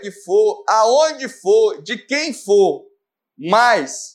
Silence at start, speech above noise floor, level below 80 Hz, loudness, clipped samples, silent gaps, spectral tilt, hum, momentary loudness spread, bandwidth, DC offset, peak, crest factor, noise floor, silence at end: 0 s; 48 dB; -80 dBFS; -16 LUFS; under 0.1%; none; -3 dB/octave; none; 10 LU; 12.5 kHz; under 0.1%; -2 dBFS; 16 dB; -64 dBFS; 0.05 s